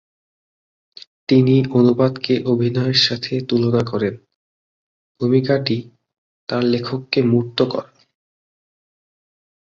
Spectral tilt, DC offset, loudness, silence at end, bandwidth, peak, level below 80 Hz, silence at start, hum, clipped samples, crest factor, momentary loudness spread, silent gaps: -7 dB/octave; under 0.1%; -18 LUFS; 1.8 s; 7.4 kHz; -2 dBFS; -56 dBFS; 1.3 s; none; under 0.1%; 18 dB; 10 LU; 4.35-5.15 s, 6.18-6.47 s